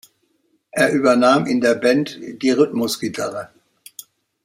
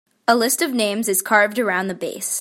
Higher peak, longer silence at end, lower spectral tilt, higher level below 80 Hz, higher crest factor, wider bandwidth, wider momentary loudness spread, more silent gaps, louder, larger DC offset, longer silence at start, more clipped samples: about the same, -2 dBFS vs -2 dBFS; first, 1 s vs 0 s; first, -4.5 dB/octave vs -2.5 dB/octave; first, -64 dBFS vs -70 dBFS; about the same, 18 dB vs 18 dB; about the same, 16 kHz vs 16.5 kHz; first, 24 LU vs 7 LU; neither; about the same, -18 LUFS vs -19 LUFS; neither; first, 0.75 s vs 0.3 s; neither